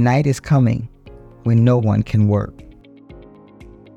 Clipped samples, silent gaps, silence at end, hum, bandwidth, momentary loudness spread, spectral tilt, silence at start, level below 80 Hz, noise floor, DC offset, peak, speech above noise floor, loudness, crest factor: under 0.1%; none; 0.75 s; none; 9.6 kHz; 11 LU; -8.5 dB/octave; 0 s; -42 dBFS; -42 dBFS; under 0.1%; -2 dBFS; 27 dB; -17 LUFS; 16 dB